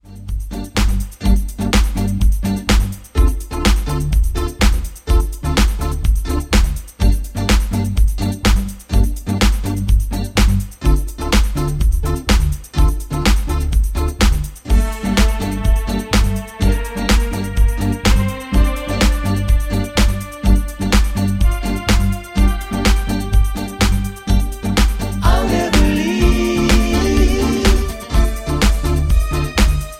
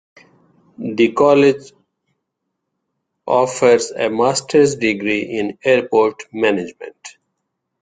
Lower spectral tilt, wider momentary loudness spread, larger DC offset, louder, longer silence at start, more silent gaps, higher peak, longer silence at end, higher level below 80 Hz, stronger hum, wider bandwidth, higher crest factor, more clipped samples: about the same, -5 dB/octave vs -4.5 dB/octave; second, 4 LU vs 15 LU; neither; about the same, -18 LUFS vs -16 LUFS; second, 0.05 s vs 0.8 s; neither; about the same, 0 dBFS vs -2 dBFS; second, 0 s vs 0.7 s; first, -16 dBFS vs -60 dBFS; neither; first, 15.5 kHz vs 9.4 kHz; about the same, 14 dB vs 16 dB; neither